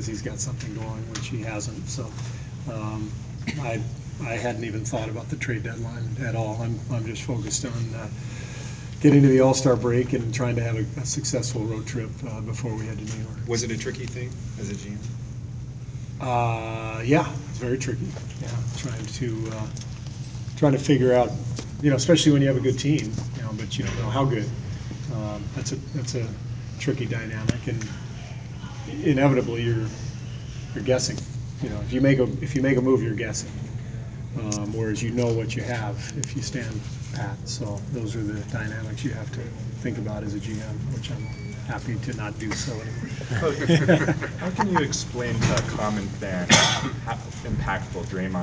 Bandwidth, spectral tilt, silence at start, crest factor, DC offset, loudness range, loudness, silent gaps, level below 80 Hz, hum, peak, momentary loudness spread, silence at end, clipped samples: 8 kHz; -5.5 dB/octave; 0 s; 24 dB; under 0.1%; 9 LU; -26 LUFS; none; -44 dBFS; none; -2 dBFS; 14 LU; 0 s; under 0.1%